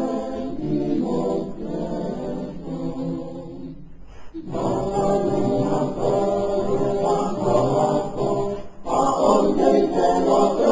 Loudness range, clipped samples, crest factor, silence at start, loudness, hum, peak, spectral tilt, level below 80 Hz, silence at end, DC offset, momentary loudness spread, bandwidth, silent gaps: 9 LU; under 0.1%; 18 dB; 0 s; -22 LUFS; none; -4 dBFS; -7 dB/octave; -46 dBFS; 0 s; 0.7%; 14 LU; 7.8 kHz; none